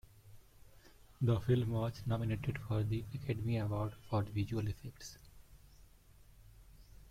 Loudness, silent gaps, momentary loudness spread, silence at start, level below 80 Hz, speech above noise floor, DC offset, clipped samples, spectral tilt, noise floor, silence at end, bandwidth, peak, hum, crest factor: -37 LUFS; none; 13 LU; 0.25 s; -58 dBFS; 25 dB; under 0.1%; under 0.1%; -7.5 dB/octave; -61 dBFS; 0 s; 15.5 kHz; -20 dBFS; none; 18 dB